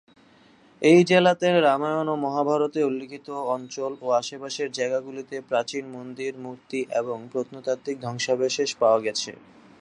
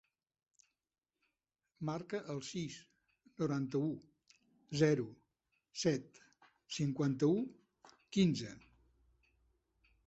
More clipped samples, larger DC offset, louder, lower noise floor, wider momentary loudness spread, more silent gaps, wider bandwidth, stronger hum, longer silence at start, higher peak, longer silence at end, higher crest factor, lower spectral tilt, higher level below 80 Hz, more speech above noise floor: neither; neither; first, -24 LUFS vs -37 LUFS; second, -55 dBFS vs under -90 dBFS; about the same, 14 LU vs 14 LU; neither; first, 10.5 kHz vs 8 kHz; neither; second, 0.8 s vs 1.8 s; first, -4 dBFS vs -18 dBFS; second, 0.45 s vs 1.5 s; about the same, 20 dB vs 22 dB; second, -4.5 dB/octave vs -6.5 dB/octave; about the same, -74 dBFS vs -74 dBFS; second, 31 dB vs over 54 dB